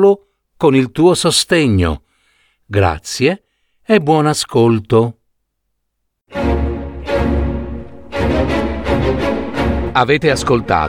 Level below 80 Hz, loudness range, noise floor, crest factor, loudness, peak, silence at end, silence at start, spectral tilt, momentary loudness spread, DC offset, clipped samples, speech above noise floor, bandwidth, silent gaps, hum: -28 dBFS; 5 LU; -71 dBFS; 14 dB; -15 LUFS; 0 dBFS; 0 s; 0 s; -5.5 dB/octave; 10 LU; under 0.1%; under 0.1%; 58 dB; 17 kHz; none; none